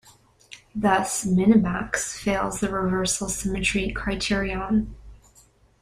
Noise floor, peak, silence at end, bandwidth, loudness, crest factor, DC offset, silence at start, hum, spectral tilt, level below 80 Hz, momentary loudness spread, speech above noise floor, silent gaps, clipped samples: -57 dBFS; -6 dBFS; 0.65 s; 15.5 kHz; -24 LUFS; 18 dB; under 0.1%; 0.5 s; none; -4.5 dB/octave; -40 dBFS; 8 LU; 34 dB; none; under 0.1%